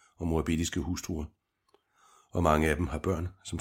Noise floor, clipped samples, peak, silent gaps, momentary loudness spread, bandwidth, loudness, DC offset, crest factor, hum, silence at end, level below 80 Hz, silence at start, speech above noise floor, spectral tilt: -71 dBFS; under 0.1%; -8 dBFS; none; 12 LU; 16.5 kHz; -31 LUFS; under 0.1%; 22 dB; none; 0 s; -42 dBFS; 0.2 s; 41 dB; -5.5 dB/octave